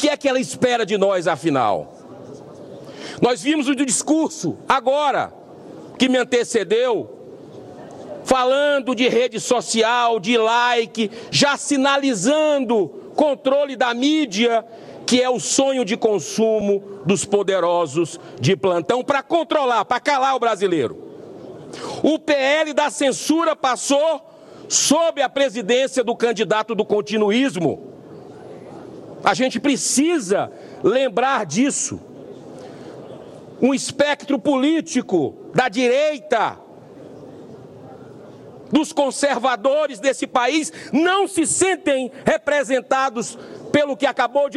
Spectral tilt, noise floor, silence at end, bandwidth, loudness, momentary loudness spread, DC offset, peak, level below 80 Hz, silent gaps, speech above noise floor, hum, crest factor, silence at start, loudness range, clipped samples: -3.5 dB/octave; -41 dBFS; 0 s; 14 kHz; -19 LUFS; 20 LU; under 0.1%; -2 dBFS; -62 dBFS; none; 22 dB; none; 18 dB; 0 s; 4 LU; under 0.1%